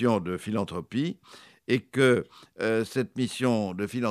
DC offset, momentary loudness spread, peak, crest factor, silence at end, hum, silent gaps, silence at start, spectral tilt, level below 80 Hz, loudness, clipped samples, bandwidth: under 0.1%; 9 LU; -8 dBFS; 18 dB; 0 s; none; none; 0 s; -6 dB/octave; -64 dBFS; -28 LUFS; under 0.1%; 14 kHz